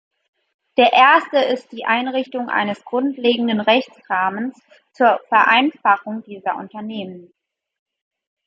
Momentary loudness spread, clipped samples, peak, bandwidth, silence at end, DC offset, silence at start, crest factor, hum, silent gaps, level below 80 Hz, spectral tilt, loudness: 16 LU; under 0.1%; -2 dBFS; 7.8 kHz; 1.25 s; under 0.1%; 0.75 s; 18 dB; none; none; -72 dBFS; -5.5 dB/octave; -17 LUFS